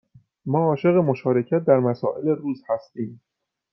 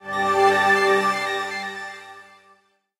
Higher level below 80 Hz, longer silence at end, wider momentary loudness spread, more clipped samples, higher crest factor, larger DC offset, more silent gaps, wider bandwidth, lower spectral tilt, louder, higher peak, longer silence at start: about the same, -68 dBFS vs -64 dBFS; second, 0.55 s vs 0.8 s; second, 14 LU vs 17 LU; neither; about the same, 20 dB vs 16 dB; neither; neither; second, 6 kHz vs 16 kHz; first, -11 dB/octave vs -3 dB/octave; about the same, -22 LUFS vs -20 LUFS; about the same, -4 dBFS vs -6 dBFS; first, 0.45 s vs 0.05 s